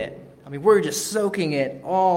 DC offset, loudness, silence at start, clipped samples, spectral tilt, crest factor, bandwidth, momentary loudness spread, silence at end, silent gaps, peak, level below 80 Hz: under 0.1%; -22 LUFS; 0 s; under 0.1%; -4.5 dB/octave; 16 dB; 16.5 kHz; 10 LU; 0 s; none; -6 dBFS; -62 dBFS